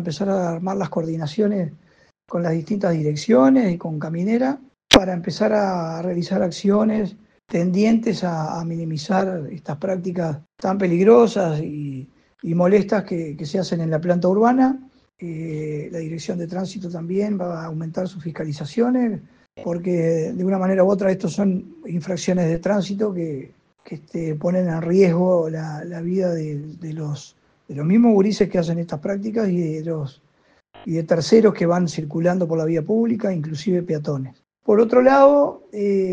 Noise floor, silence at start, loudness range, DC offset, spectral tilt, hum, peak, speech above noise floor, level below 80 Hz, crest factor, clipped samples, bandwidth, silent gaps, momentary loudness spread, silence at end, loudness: -60 dBFS; 0 s; 5 LU; under 0.1%; -6.5 dB/octave; none; 0 dBFS; 40 dB; -52 dBFS; 20 dB; under 0.1%; 9.8 kHz; none; 14 LU; 0 s; -20 LUFS